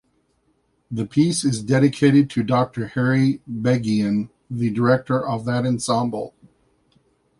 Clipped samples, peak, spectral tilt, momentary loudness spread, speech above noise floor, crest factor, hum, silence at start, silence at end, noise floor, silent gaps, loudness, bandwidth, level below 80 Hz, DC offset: under 0.1%; -4 dBFS; -6.5 dB/octave; 10 LU; 46 dB; 18 dB; none; 0.9 s; 1.1 s; -66 dBFS; none; -20 LUFS; 11.5 kHz; -56 dBFS; under 0.1%